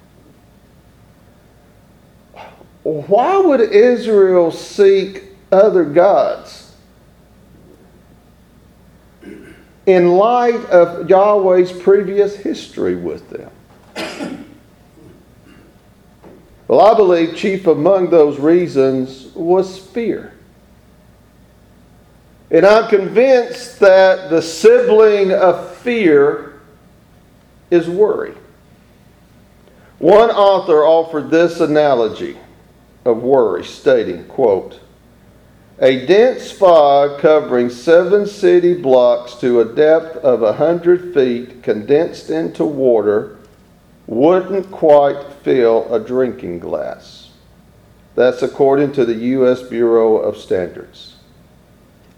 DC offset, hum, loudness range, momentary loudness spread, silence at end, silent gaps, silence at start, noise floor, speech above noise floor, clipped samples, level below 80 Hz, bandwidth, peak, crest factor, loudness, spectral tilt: under 0.1%; none; 8 LU; 13 LU; 1.15 s; none; 2.4 s; -47 dBFS; 35 dB; under 0.1%; -52 dBFS; 12 kHz; 0 dBFS; 14 dB; -13 LUFS; -6.5 dB/octave